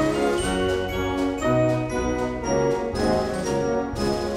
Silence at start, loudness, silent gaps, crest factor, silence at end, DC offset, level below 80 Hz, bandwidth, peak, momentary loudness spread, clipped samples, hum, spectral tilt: 0 s; -24 LUFS; none; 14 dB; 0 s; under 0.1%; -38 dBFS; 16 kHz; -8 dBFS; 4 LU; under 0.1%; none; -5.5 dB/octave